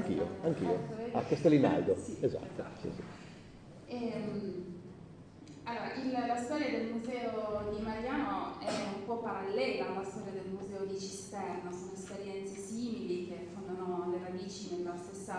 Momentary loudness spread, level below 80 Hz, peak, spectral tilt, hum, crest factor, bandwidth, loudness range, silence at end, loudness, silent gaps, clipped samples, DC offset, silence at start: 12 LU; -64 dBFS; -14 dBFS; -6 dB/octave; none; 22 dB; 10 kHz; 8 LU; 0 s; -37 LUFS; none; under 0.1%; under 0.1%; 0 s